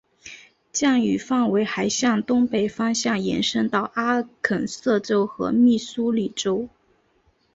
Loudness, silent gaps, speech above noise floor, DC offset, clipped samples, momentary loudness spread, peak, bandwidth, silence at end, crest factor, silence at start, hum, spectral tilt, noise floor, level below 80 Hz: -22 LUFS; none; 42 dB; under 0.1%; under 0.1%; 6 LU; -4 dBFS; 8 kHz; 0.85 s; 18 dB; 0.25 s; none; -4 dB/octave; -64 dBFS; -60 dBFS